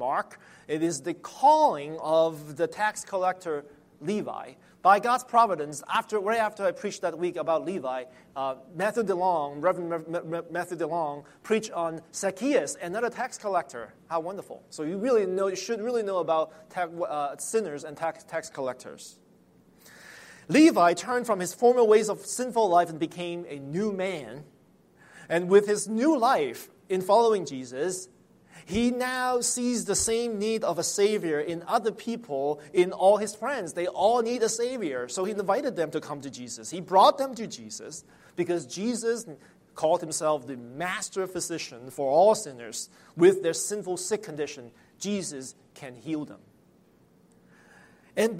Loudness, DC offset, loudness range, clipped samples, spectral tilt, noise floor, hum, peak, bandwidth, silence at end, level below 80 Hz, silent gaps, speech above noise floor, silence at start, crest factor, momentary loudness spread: -27 LUFS; under 0.1%; 5 LU; under 0.1%; -4 dB/octave; -60 dBFS; none; -6 dBFS; 16 kHz; 0 s; -66 dBFS; none; 34 dB; 0 s; 20 dB; 16 LU